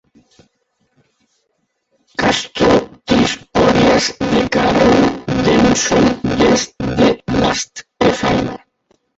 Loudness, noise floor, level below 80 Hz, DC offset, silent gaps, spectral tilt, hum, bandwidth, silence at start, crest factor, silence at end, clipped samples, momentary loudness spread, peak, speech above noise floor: -14 LUFS; -68 dBFS; -36 dBFS; under 0.1%; none; -4.5 dB/octave; none; 8.2 kHz; 2.2 s; 14 dB; 0.6 s; under 0.1%; 7 LU; 0 dBFS; 55 dB